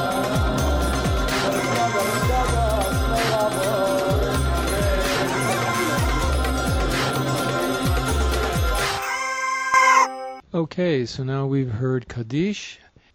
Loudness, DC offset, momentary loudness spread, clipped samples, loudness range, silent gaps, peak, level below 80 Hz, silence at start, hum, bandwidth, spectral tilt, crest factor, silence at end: -22 LUFS; under 0.1%; 4 LU; under 0.1%; 2 LU; none; -4 dBFS; -28 dBFS; 0 s; none; 16.5 kHz; -4.5 dB/octave; 16 dB; 0.4 s